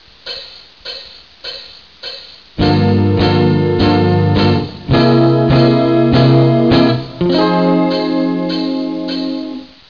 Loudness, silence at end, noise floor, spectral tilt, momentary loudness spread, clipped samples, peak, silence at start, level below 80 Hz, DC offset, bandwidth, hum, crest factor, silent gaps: -13 LUFS; 0.25 s; -35 dBFS; -8.5 dB/octave; 17 LU; under 0.1%; -2 dBFS; 0.25 s; -36 dBFS; 0.4%; 5.4 kHz; none; 12 dB; none